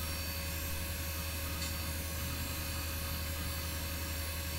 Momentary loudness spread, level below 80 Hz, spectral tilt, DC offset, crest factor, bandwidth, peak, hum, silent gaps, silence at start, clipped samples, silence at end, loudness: 1 LU; -42 dBFS; -3.5 dB/octave; under 0.1%; 12 dB; 16 kHz; -26 dBFS; none; none; 0 s; under 0.1%; 0 s; -37 LUFS